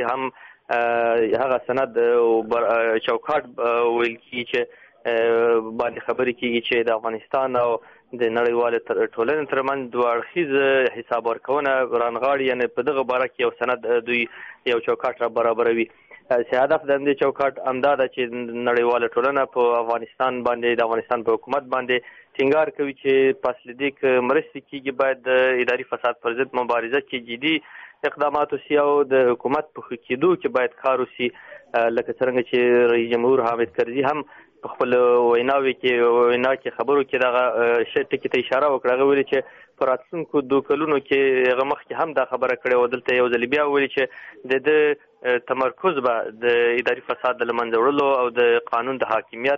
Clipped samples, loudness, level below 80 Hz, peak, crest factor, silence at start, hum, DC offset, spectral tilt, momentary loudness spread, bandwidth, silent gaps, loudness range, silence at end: under 0.1%; -21 LUFS; -64 dBFS; -6 dBFS; 14 dB; 0 s; none; under 0.1%; -2.5 dB/octave; 7 LU; 5.8 kHz; none; 3 LU; 0 s